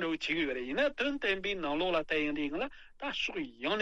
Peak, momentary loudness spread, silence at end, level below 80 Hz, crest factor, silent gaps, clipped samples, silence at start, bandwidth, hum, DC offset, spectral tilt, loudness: -16 dBFS; 7 LU; 0 s; -58 dBFS; 18 dB; none; under 0.1%; 0 s; 8 kHz; none; under 0.1%; -4.5 dB/octave; -33 LUFS